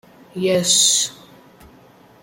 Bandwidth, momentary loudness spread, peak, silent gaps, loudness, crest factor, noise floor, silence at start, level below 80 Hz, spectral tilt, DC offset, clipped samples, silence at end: 16.5 kHz; 12 LU; -2 dBFS; none; -16 LUFS; 20 dB; -49 dBFS; 0.35 s; -60 dBFS; -1.5 dB/octave; under 0.1%; under 0.1%; 1.1 s